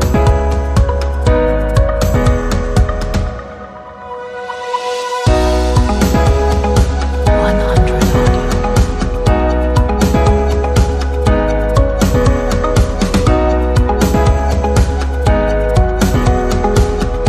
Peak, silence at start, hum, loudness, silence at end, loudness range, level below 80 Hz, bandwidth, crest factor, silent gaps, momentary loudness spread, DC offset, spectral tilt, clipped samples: 0 dBFS; 0 s; none; -14 LUFS; 0 s; 4 LU; -16 dBFS; 14 kHz; 12 dB; none; 6 LU; under 0.1%; -6.5 dB/octave; under 0.1%